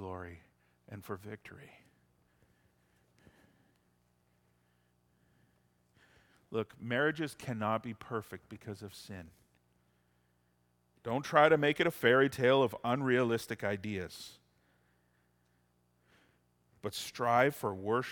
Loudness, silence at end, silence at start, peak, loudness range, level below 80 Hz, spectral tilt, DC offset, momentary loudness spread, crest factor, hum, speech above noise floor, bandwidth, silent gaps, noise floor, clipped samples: -32 LUFS; 0 s; 0 s; -10 dBFS; 20 LU; -72 dBFS; -5.5 dB/octave; under 0.1%; 21 LU; 26 dB; 60 Hz at -65 dBFS; 41 dB; 18 kHz; none; -74 dBFS; under 0.1%